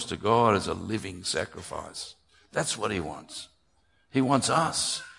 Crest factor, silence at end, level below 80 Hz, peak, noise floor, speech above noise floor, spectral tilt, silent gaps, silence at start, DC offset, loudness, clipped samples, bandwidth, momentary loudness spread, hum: 22 dB; 0.05 s; -60 dBFS; -8 dBFS; -69 dBFS; 41 dB; -4 dB/octave; none; 0 s; under 0.1%; -27 LUFS; under 0.1%; 11.5 kHz; 16 LU; none